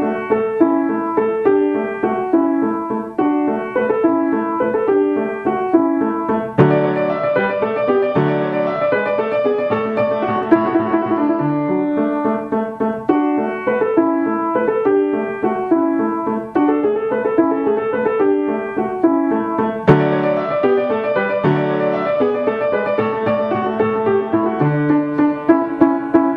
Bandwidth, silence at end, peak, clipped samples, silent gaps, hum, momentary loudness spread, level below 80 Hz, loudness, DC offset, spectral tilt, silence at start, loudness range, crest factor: 5.2 kHz; 0 s; 0 dBFS; under 0.1%; none; none; 4 LU; -54 dBFS; -17 LUFS; under 0.1%; -9.5 dB/octave; 0 s; 1 LU; 16 dB